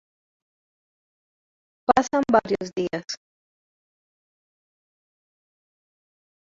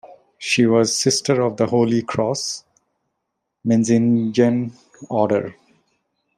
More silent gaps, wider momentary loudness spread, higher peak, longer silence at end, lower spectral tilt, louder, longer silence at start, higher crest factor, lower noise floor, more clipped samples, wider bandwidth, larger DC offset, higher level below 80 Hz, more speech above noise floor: neither; about the same, 13 LU vs 12 LU; about the same, -2 dBFS vs -2 dBFS; first, 3.4 s vs 0.85 s; about the same, -4.5 dB/octave vs -5 dB/octave; second, -23 LUFS vs -19 LUFS; first, 1.9 s vs 0.05 s; first, 26 dB vs 18 dB; first, under -90 dBFS vs -77 dBFS; neither; second, 7.8 kHz vs 13 kHz; neither; about the same, -62 dBFS vs -62 dBFS; first, over 68 dB vs 59 dB